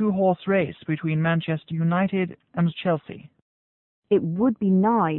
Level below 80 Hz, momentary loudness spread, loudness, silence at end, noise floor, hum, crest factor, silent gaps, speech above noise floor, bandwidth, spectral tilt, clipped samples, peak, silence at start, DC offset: -62 dBFS; 8 LU; -24 LUFS; 0 s; under -90 dBFS; none; 14 dB; 3.42-4.02 s; over 67 dB; 4.1 kHz; -12.5 dB/octave; under 0.1%; -10 dBFS; 0 s; under 0.1%